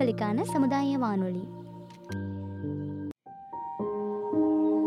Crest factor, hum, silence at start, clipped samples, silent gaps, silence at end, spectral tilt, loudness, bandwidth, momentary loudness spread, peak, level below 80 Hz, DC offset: 16 dB; none; 0 s; under 0.1%; none; 0 s; -7.5 dB/octave; -30 LUFS; 13 kHz; 16 LU; -14 dBFS; -68 dBFS; under 0.1%